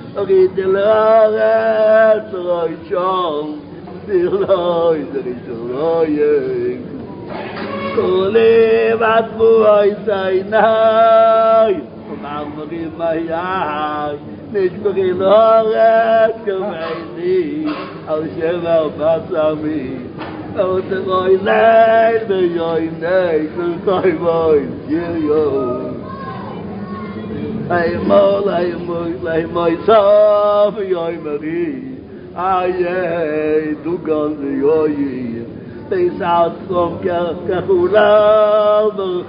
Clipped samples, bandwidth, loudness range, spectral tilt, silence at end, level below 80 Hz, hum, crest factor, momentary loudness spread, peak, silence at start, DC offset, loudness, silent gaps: under 0.1%; 5.2 kHz; 6 LU; -11.5 dB/octave; 0 s; -48 dBFS; none; 14 dB; 15 LU; 0 dBFS; 0 s; under 0.1%; -15 LUFS; none